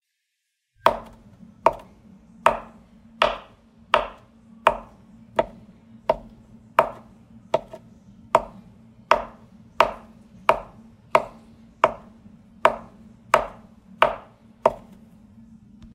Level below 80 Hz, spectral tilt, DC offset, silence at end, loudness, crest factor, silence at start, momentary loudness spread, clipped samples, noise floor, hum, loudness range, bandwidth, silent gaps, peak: -52 dBFS; -4 dB/octave; under 0.1%; 1.2 s; -24 LUFS; 26 dB; 0.85 s; 16 LU; under 0.1%; -78 dBFS; none; 3 LU; 16 kHz; none; 0 dBFS